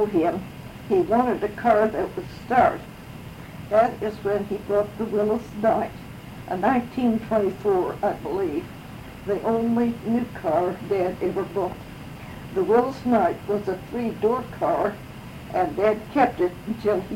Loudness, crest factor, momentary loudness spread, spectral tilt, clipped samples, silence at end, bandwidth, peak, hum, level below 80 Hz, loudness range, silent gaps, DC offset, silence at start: -24 LUFS; 18 dB; 18 LU; -7.5 dB/octave; under 0.1%; 0 s; 16.5 kHz; -6 dBFS; none; -50 dBFS; 2 LU; none; under 0.1%; 0 s